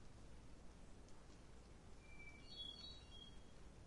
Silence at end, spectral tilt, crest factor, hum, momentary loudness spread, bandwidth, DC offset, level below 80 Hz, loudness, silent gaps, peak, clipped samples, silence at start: 0 s; -4 dB/octave; 16 dB; none; 12 LU; 11 kHz; under 0.1%; -64 dBFS; -59 LUFS; none; -42 dBFS; under 0.1%; 0 s